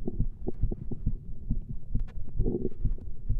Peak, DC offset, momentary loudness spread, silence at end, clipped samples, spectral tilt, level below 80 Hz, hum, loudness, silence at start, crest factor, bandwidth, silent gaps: -14 dBFS; under 0.1%; 6 LU; 0 s; under 0.1%; -12.5 dB/octave; -32 dBFS; none; -36 LUFS; 0 s; 14 dB; 1.1 kHz; none